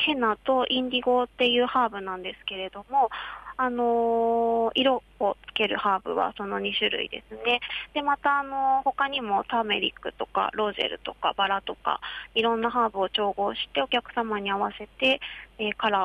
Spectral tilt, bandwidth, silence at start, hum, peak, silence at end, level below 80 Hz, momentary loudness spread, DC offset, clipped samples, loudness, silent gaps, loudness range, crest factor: -5 dB/octave; 9.4 kHz; 0 s; none; -10 dBFS; 0 s; -58 dBFS; 7 LU; under 0.1%; under 0.1%; -26 LUFS; none; 2 LU; 16 dB